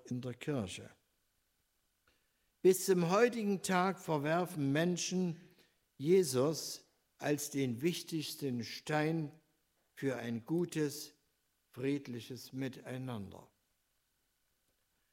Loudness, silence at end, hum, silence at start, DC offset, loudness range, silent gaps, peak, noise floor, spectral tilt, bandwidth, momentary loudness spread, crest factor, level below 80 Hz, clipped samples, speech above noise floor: -36 LUFS; 1.75 s; none; 0.05 s; under 0.1%; 11 LU; none; -16 dBFS; -80 dBFS; -5 dB/octave; 16 kHz; 15 LU; 20 dB; -80 dBFS; under 0.1%; 45 dB